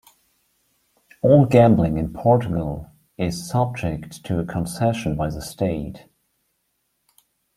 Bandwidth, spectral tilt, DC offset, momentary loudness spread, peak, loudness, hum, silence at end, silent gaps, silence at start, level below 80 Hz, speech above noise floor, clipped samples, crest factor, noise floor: 15 kHz; -7.5 dB/octave; under 0.1%; 14 LU; -2 dBFS; -21 LUFS; none; 1.6 s; none; 1.25 s; -44 dBFS; 52 dB; under 0.1%; 20 dB; -72 dBFS